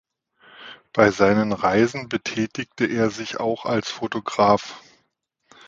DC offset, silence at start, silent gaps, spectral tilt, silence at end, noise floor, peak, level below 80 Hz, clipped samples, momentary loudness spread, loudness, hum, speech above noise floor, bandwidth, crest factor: under 0.1%; 0.6 s; none; -5.5 dB/octave; 0.9 s; -71 dBFS; 0 dBFS; -56 dBFS; under 0.1%; 9 LU; -22 LUFS; none; 50 dB; 7.8 kHz; 22 dB